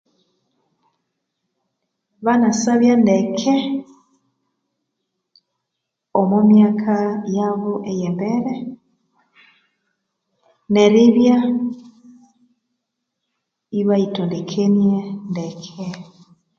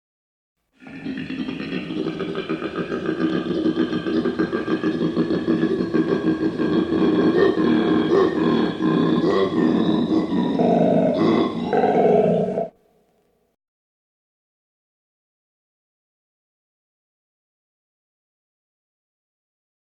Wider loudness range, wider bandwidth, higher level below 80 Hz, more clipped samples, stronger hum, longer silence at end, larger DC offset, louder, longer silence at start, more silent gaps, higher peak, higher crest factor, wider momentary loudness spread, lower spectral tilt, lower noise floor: about the same, 6 LU vs 7 LU; about the same, 7.6 kHz vs 7.4 kHz; second, -66 dBFS vs -56 dBFS; neither; neither; second, 0.55 s vs 7.25 s; neither; first, -17 LUFS vs -21 LUFS; first, 2.2 s vs 0.8 s; neither; first, 0 dBFS vs -6 dBFS; about the same, 18 dB vs 16 dB; first, 16 LU vs 10 LU; second, -6.5 dB/octave vs -8 dB/octave; first, -79 dBFS vs -64 dBFS